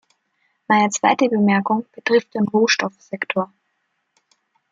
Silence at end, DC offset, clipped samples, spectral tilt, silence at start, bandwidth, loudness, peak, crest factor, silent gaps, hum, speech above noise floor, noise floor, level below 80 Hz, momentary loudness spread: 1.25 s; under 0.1%; under 0.1%; -4.5 dB/octave; 0.7 s; 7.6 kHz; -19 LUFS; -2 dBFS; 18 dB; none; none; 53 dB; -71 dBFS; -72 dBFS; 8 LU